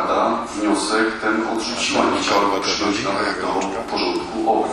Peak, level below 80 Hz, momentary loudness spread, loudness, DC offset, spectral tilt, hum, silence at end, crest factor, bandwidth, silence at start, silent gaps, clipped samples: -2 dBFS; -50 dBFS; 5 LU; -20 LUFS; under 0.1%; -3 dB/octave; none; 0 s; 18 dB; 12 kHz; 0 s; none; under 0.1%